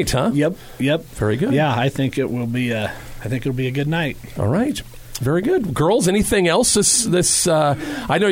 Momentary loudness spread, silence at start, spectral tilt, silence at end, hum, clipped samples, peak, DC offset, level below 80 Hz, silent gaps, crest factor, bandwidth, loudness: 10 LU; 0 s; -4.5 dB/octave; 0 s; none; under 0.1%; -4 dBFS; under 0.1%; -40 dBFS; none; 14 dB; 17 kHz; -19 LUFS